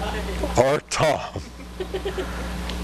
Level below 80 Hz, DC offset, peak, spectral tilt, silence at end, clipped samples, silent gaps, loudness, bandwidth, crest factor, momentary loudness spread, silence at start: -34 dBFS; under 0.1%; -4 dBFS; -4.5 dB/octave; 0 s; under 0.1%; none; -25 LUFS; 13 kHz; 22 dB; 14 LU; 0 s